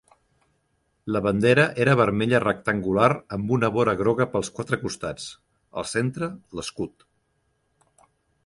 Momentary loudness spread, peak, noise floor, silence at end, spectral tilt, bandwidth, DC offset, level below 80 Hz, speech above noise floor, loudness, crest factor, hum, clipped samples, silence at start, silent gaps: 15 LU; -4 dBFS; -71 dBFS; 1.55 s; -6 dB/octave; 11.5 kHz; under 0.1%; -54 dBFS; 48 dB; -23 LUFS; 20 dB; none; under 0.1%; 1.05 s; none